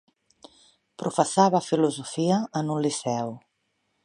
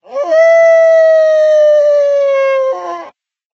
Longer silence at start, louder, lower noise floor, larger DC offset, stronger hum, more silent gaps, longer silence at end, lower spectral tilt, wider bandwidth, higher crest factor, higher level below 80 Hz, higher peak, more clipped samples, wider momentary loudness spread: first, 1 s vs 0.1 s; second, -25 LUFS vs -9 LUFS; first, -74 dBFS vs -39 dBFS; neither; neither; neither; first, 0.65 s vs 0.45 s; first, -5.5 dB/octave vs 1.5 dB/octave; first, 11.5 kHz vs 6.8 kHz; first, 22 dB vs 10 dB; first, -74 dBFS vs -82 dBFS; second, -4 dBFS vs 0 dBFS; neither; about the same, 11 LU vs 11 LU